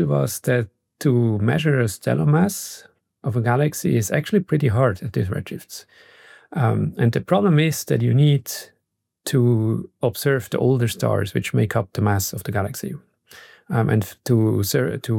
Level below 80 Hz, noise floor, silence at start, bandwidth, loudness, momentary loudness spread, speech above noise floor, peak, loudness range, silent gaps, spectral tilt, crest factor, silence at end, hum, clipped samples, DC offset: -58 dBFS; -75 dBFS; 0 s; 17 kHz; -21 LUFS; 13 LU; 55 dB; -6 dBFS; 3 LU; none; -6.5 dB/octave; 14 dB; 0 s; none; under 0.1%; under 0.1%